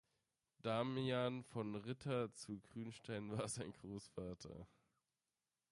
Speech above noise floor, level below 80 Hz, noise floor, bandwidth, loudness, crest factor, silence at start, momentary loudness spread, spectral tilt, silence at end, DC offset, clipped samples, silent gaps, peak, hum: over 45 dB; -74 dBFS; under -90 dBFS; 11.5 kHz; -46 LUFS; 18 dB; 0.65 s; 12 LU; -5.5 dB/octave; 1.05 s; under 0.1%; under 0.1%; none; -28 dBFS; none